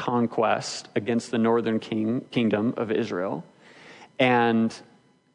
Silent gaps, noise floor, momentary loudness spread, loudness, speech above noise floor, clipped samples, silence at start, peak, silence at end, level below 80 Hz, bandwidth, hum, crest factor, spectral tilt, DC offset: none; -49 dBFS; 9 LU; -25 LUFS; 25 dB; under 0.1%; 0 s; -8 dBFS; 0.55 s; -74 dBFS; 10.5 kHz; none; 16 dB; -5.5 dB/octave; under 0.1%